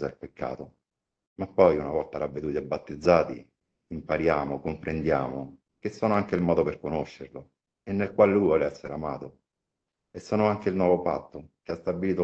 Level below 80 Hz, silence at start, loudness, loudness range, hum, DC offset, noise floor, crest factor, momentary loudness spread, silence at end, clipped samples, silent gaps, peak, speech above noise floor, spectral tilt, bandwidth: -54 dBFS; 0 s; -27 LUFS; 3 LU; none; under 0.1%; -85 dBFS; 22 dB; 21 LU; 0 s; under 0.1%; 1.27-1.36 s; -6 dBFS; 59 dB; -8 dB/octave; 8 kHz